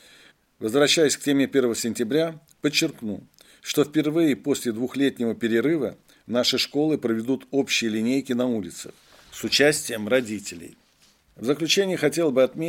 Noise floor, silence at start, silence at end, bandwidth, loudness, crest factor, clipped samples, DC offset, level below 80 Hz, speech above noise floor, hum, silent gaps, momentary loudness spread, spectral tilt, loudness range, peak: -60 dBFS; 0.6 s; 0 s; 17 kHz; -23 LUFS; 20 dB; under 0.1%; under 0.1%; -66 dBFS; 37 dB; none; none; 13 LU; -3.5 dB/octave; 2 LU; -4 dBFS